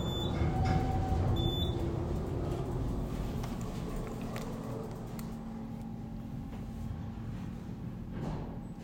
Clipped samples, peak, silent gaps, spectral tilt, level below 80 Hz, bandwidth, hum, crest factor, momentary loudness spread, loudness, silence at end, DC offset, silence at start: under 0.1%; -16 dBFS; none; -7 dB/octave; -42 dBFS; 16 kHz; none; 18 dB; 11 LU; -37 LUFS; 0 s; under 0.1%; 0 s